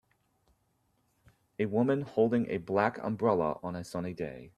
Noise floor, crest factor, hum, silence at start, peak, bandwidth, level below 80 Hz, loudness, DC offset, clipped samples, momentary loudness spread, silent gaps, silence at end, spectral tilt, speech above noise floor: -74 dBFS; 22 dB; none; 1.6 s; -12 dBFS; 12.5 kHz; -66 dBFS; -31 LUFS; under 0.1%; under 0.1%; 10 LU; none; 0.1 s; -8 dB/octave; 44 dB